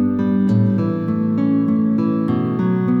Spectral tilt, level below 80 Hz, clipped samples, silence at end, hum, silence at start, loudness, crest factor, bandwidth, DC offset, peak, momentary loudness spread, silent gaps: -11 dB/octave; -58 dBFS; under 0.1%; 0 s; none; 0 s; -18 LUFS; 10 dB; 4.8 kHz; under 0.1%; -6 dBFS; 3 LU; none